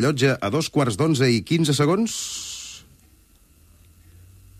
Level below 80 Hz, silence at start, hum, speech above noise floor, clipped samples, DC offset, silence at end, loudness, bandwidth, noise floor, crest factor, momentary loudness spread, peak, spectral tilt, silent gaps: -56 dBFS; 0 s; none; 34 dB; under 0.1%; under 0.1%; 1.8 s; -21 LUFS; 15 kHz; -55 dBFS; 16 dB; 14 LU; -6 dBFS; -5 dB/octave; none